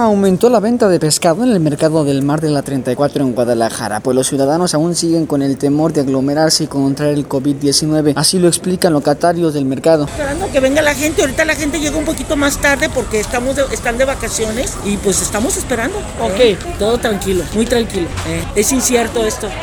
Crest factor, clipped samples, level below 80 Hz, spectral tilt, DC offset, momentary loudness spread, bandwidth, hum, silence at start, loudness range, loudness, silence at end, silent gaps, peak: 14 dB; under 0.1%; -32 dBFS; -4.5 dB/octave; under 0.1%; 6 LU; over 20 kHz; none; 0 s; 2 LU; -14 LUFS; 0 s; none; 0 dBFS